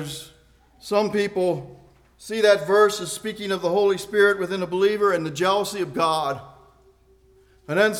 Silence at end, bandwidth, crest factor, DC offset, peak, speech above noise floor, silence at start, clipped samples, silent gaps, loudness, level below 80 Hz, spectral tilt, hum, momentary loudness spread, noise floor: 0 s; 16 kHz; 18 dB; under 0.1%; -6 dBFS; 35 dB; 0 s; under 0.1%; none; -22 LUFS; -60 dBFS; -4 dB/octave; none; 13 LU; -56 dBFS